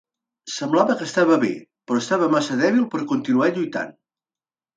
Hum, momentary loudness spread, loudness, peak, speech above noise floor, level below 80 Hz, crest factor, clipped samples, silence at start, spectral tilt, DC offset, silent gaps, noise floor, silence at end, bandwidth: none; 12 LU; -21 LUFS; -2 dBFS; over 70 dB; -70 dBFS; 20 dB; under 0.1%; 0.45 s; -5 dB/octave; under 0.1%; none; under -90 dBFS; 0.85 s; 9.2 kHz